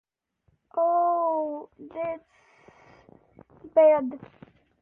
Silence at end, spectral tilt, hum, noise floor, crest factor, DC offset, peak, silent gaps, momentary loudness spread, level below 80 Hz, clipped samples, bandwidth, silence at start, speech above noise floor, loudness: 0.55 s; -8.5 dB/octave; none; -71 dBFS; 18 dB; under 0.1%; -10 dBFS; none; 20 LU; -70 dBFS; under 0.1%; 3.4 kHz; 0.75 s; 46 dB; -25 LUFS